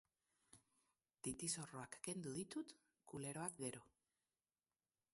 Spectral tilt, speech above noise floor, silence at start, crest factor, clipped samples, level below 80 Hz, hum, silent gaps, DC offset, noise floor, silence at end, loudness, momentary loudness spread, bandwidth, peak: -3.5 dB/octave; over 40 dB; 0.55 s; 22 dB; under 0.1%; -80 dBFS; none; none; under 0.1%; under -90 dBFS; 1.25 s; -49 LUFS; 12 LU; 12 kHz; -30 dBFS